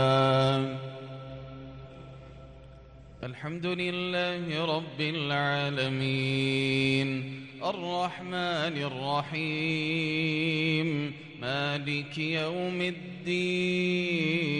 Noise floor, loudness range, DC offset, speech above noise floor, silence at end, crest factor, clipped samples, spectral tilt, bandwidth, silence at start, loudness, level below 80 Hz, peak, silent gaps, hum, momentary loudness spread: -50 dBFS; 6 LU; under 0.1%; 20 dB; 0 s; 18 dB; under 0.1%; -6 dB/octave; 10.5 kHz; 0 s; -29 LUFS; -60 dBFS; -12 dBFS; none; none; 16 LU